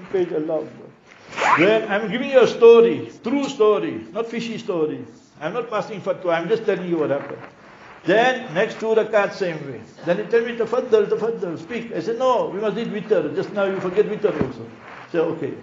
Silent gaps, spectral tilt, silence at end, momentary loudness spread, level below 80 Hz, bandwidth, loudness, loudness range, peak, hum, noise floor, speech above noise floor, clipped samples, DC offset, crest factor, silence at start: none; -4 dB/octave; 0 s; 12 LU; -62 dBFS; 7.6 kHz; -20 LUFS; 7 LU; -2 dBFS; none; -44 dBFS; 24 dB; under 0.1%; under 0.1%; 20 dB; 0 s